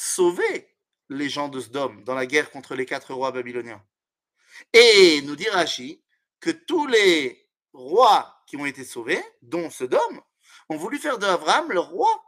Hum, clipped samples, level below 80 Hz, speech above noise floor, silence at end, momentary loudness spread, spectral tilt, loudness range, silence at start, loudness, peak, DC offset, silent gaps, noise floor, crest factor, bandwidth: none; under 0.1%; -76 dBFS; 57 dB; 0.05 s; 15 LU; -2.5 dB/octave; 9 LU; 0 s; -21 LUFS; 0 dBFS; under 0.1%; none; -79 dBFS; 22 dB; 15.5 kHz